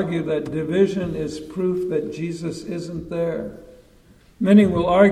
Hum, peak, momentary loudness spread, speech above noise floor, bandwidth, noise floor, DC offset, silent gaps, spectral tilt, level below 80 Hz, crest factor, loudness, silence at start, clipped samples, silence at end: none; -2 dBFS; 14 LU; 32 dB; 10 kHz; -52 dBFS; under 0.1%; none; -7.5 dB/octave; -48 dBFS; 20 dB; -22 LUFS; 0 s; under 0.1%; 0 s